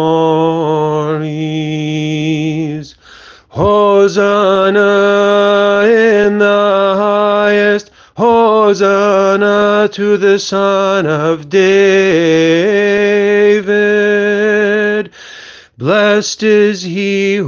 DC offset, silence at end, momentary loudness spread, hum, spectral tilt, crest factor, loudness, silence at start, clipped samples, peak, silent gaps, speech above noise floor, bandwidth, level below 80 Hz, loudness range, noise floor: under 0.1%; 0 s; 8 LU; none; -5.5 dB/octave; 10 dB; -11 LUFS; 0 s; under 0.1%; 0 dBFS; none; 28 dB; 7.2 kHz; -50 dBFS; 4 LU; -38 dBFS